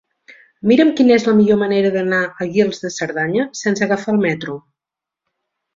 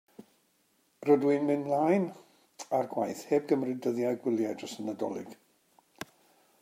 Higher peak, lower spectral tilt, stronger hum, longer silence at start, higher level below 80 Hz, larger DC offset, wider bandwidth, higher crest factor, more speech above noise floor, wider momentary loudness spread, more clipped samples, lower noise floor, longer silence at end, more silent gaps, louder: first, -2 dBFS vs -12 dBFS; about the same, -5.5 dB/octave vs -6.5 dB/octave; neither; first, 0.65 s vs 0.2 s; first, -58 dBFS vs -82 dBFS; neither; second, 7.8 kHz vs 16 kHz; about the same, 16 dB vs 20 dB; first, 70 dB vs 42 dB; second, 11 LU vs 20 LU; neither; first, -86 dBFS vs -71 dBFS; second, 1.15 s vs 1.3 s; neither; first, -16 LUFS vs -30 LUFS